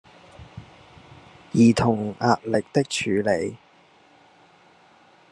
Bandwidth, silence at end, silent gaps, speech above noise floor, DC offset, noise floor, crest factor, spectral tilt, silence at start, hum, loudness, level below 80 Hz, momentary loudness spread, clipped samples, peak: 11.5 kHz; 1.75 s; none; 35 dB; under 0.1%; -55 dBFS; 22 dB; -6 dB/octave; 0.4 s; none; -22 LUFS; -56 dBFS; 26 LU; under 0.1%; -4 dBFS